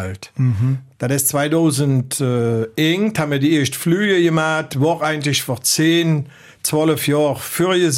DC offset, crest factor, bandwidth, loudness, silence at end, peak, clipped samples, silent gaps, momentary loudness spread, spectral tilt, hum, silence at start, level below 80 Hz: under 0.1%; 14 dB; 16.5 kHz; -17 LUFS; 0 s; -4 dBFS; under 0.1%; none; 6 LU; -5 dB/octave; none; 0 s; -56 dBFS